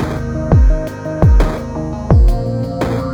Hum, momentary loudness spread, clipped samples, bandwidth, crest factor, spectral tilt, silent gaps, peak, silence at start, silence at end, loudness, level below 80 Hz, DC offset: none; 10 LU; under 0.1%; 8.2 kHz; 12 dB; -8.5 dB/octave; none; -2 dBFS; 0 s; 0 s; -15 LUFS; -16 dBFS; under 0.1%